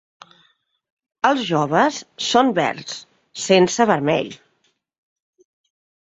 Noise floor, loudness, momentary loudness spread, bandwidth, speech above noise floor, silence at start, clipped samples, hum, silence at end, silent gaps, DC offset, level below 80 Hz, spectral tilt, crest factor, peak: -67 dBFS; -18 LUFS; 16 LU; 8 kHz; 48 dB; 1.25 s; under 0.1%; none; 1.7 s; none; under 0.1%; -64 dBFS; -4 dB/octave; 20 dB; -2 dBFS